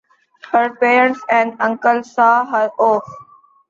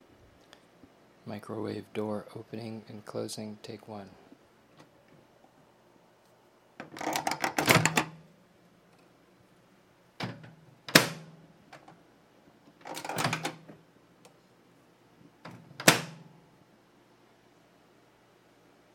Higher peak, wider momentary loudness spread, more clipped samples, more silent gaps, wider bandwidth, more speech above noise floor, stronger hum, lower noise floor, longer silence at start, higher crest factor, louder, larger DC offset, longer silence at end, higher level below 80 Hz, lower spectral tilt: about the same, -2 dBFS vs 0 dBFS; second, 6 LU vs 28 LU; neither; neither; second, 7.6 kHz vs 16.5 kHz; first, 28 dB vs 23 dB; neither; second, -43 dBFS vs -62 dBFS; second, 0.5 s vs 1.25 s; second, 16 dB vs 36 dB; first, -15 LUFS vs -30 LUFS; neither; second, 0.5 s vs 2.7 s; about the same, -68 dBFS vs -70 dBFS; first, -5 dB/octave vs -3 dB/octave